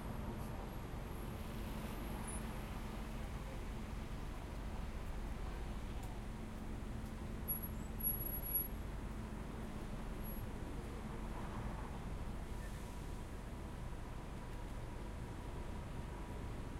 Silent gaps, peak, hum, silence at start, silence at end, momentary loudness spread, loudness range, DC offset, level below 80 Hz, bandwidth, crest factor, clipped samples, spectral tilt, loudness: none; -26 dBFS; none; 0 s; 0 s; 8 LU; 6 LU; under 0.1%; -48 dBFS; 16 kHz; 18 dB; under 0.1%; -5 dB/octave; -46 LUFS